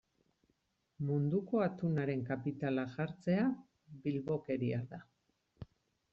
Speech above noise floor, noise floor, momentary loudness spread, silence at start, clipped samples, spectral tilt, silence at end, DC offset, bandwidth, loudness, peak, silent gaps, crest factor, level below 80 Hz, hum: 44 dB; -79 dBFS; 18 LU; 1 s; under 0.1%; -8 dB/octave; 0.5 s; under 0.1%; 7.2 kHz; -37 LUFS; -22 dBFS; none; 16 dB; -72 dBFS; none